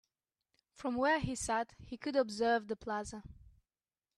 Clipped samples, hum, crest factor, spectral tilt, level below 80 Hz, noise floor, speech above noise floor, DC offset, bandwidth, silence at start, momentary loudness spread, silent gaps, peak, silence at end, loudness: under 0.1%; none; 18 dB; -4 dB/octave; -60 dBFS; under -90 dBFS; over 55 dB; under 0.1%; 13 kHz; 0.8 s; 12 LU; none; -20 dBFS; 0.85 s; -35 LUFS